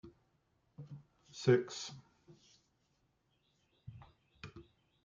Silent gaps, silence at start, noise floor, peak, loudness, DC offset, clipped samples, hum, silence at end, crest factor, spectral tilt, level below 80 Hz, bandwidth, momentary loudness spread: none; 0.05 s; -78 dBFS; -16 dBFS; -35 LUFS; under 0.1%; under 0.1%; none; 0.4 s; 26 dB; -6 dB/octave; -74 dBFS; 7.6 kHz; 27 LU